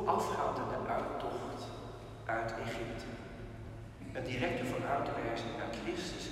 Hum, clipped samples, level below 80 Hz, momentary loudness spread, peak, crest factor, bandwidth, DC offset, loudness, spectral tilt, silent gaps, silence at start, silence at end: none; under 0.1%; -54 dBFS; 12 LU; -18 dBFS; 20 dB; 15.5 kHz; under 0.1%; -38 LUFS; -5.5 dB/octave; none; 0 s; 0 s